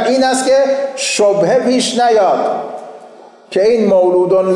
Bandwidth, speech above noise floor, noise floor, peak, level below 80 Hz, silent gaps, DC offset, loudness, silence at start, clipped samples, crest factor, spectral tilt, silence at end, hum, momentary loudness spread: 11.5 kHz; 26 dB; -38 dBFS; -4 dBFS; -60 dBFS; none; under 0.1%; -12 LUFS; 0 s; under 0.1%; 8 dB; -4 dB/octave; 0 s; none; 8 LU